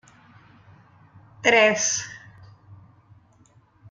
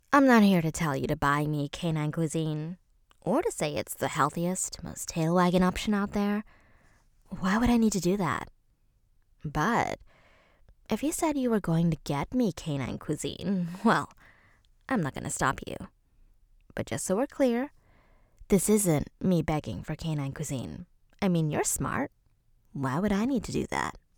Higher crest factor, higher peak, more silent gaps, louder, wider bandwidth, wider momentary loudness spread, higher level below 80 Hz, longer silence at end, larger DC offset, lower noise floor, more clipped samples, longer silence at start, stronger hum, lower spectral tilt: about the same, 22 dB vs 22 dB; about the same, -4 dBFS vs -6 dBFS; neither; first, -20 LUFS vs -28 LUFS; second, 10.5 kHz vs over 20 kHz; first, 22 LU vs 12 LU; second, -68 dBFS vs -50 dBFS; first, 1.15 s vs 0.2 s; neither; second, -57 dBFS vs -67 dBFS; neither; first, 1.45 s vs 0.1 s; neither; second, -1.5 dB/octave vs -5.5 dB/octave